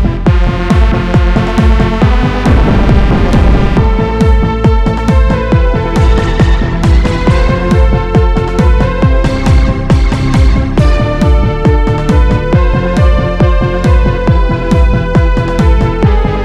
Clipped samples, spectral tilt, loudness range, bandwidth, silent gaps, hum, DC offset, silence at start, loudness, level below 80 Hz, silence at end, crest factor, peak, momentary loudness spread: 0.4%; -7.5 dB/octave; 1 LU; 9.2 kHz; none; none; under 0.1%; 0 s; -10 LUFS; -10 dBFS; 0 s; 8 dB; 0 dBFS; 1 LU